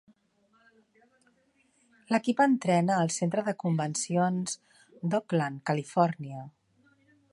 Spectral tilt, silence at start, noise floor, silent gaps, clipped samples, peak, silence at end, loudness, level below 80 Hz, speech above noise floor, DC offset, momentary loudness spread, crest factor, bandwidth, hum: -5.5 dB/octave; 2.1 s; -69 dBFS; none; under 0.1%; -10 dBFS; 0.85 s; -28 LUFS; -76 dBFS; 41 dB; under 0.1%; 13 LU; 20 dB; 11.5 kHz; none